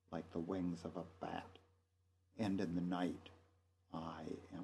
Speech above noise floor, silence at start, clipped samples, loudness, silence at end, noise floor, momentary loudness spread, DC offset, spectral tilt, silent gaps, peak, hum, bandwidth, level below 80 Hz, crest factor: 35 dB; 0.1 s; under 0.1%; -45 LUFS; 0 s; -79 dBFS; 13 LU; under 0.1%; -7.5 dB/octave; none; -26 dBFS; none; 12 kHz; -74 dBFS; 18 dB